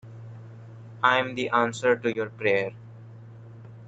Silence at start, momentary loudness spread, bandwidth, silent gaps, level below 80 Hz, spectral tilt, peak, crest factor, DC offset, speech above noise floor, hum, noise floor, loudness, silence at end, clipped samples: 0.05 s; 23 LU; 9 kHz; none; -70 dBFS; -5 dB/octave; -6 dBFS; 22 dB; under 0.1%; 20 dB; none; -45 dBFS; -25 LUFS; 0 s; under 0.1%